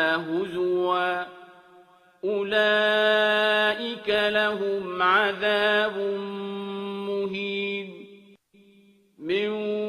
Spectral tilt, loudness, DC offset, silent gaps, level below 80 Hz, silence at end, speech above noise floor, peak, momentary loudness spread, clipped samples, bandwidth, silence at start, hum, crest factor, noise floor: -5 dB/octave; -24 LUFS; under 0.1%; none; -70 dBFS; 0 s; 34 dB; -8 dBFS; 12 LU; under 0.1%; 13.5 kHz; 0 s; none; 18 dB; -57 dBFS